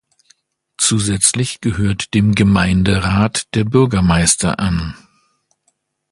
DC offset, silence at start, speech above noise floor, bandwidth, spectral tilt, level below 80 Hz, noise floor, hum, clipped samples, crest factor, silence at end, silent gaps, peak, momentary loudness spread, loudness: under 0.1%; 0.8 s; 51 dB; 11.5 kHz; -4.5 dB/octave; -32 dBFS; -65 dBFS; none; under 0.1%; 16 dB; 1.15 s; none; 0 dBFS; 6 LU; -15 LUFS